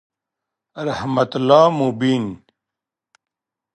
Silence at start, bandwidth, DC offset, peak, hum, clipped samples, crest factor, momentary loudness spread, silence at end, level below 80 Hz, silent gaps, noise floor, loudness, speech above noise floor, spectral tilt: 0.75 s; 9 kHz; under 0.1%; 0 dBFS; none; under 0.1%; 20 dB; 14 LU; 1.4 s; -58 dBFS; none; -86 dBFS; -17 LUFS; 69 dB; -6.5 dB/octave